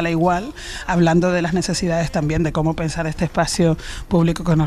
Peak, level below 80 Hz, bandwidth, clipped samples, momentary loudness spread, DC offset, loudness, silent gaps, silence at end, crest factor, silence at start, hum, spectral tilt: -4 dBFS; -34 dBFS; 13 kHz; under 0.1%; 7 LU; under 0.1%; -19 LUFS; none; 0 s; 14 dB; 0 s; none; -6 dB/octave